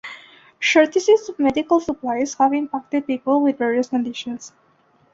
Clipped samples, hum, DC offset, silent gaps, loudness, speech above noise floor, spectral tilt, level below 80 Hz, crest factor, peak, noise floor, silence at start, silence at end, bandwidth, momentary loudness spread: under 0.1%; none; under 0.1%; none; -19 LUFS; 39 dB; -3.5 dB/octave; -60 dBFS; 18 dB; -2 dBFS; -59 dBFS; 0.05 s; 0.65 s; 7.8 kHz; 13 LU